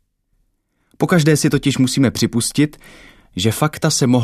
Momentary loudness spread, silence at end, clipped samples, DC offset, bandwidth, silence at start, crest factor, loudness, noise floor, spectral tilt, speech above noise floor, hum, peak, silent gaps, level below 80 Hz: 7 LU; 0 s; under 0.1%; under 0.1%; 14 kHz; 1 s; 16 dB; -16 LUFS; -65 dBFS; -5 dB/octave; 49 dB; none; 0 dBFS; none; -48 dBFS